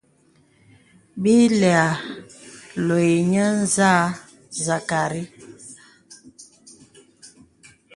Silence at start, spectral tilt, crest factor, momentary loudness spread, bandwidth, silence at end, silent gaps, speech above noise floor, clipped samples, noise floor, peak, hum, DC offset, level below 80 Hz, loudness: 1.15 s; -5 dB/octave; 20 dB; 24 LU; 11.5 kHz; 0.7 s; none; 40 dB; under 0.1%; -59 dBFS; -2 dBFS; none; under 0.1%; -62 dBFS; -19 LUFS